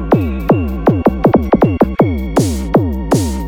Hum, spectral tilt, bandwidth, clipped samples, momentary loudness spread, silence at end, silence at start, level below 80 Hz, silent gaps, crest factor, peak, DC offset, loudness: none; -7.5 dB/octave; 19 kHz; under 0.1%; 4 LU; 0 s; 0 s; -24 dBFS; none; 12 dB; 0 dBFS; under 0.1%; -14 LUFS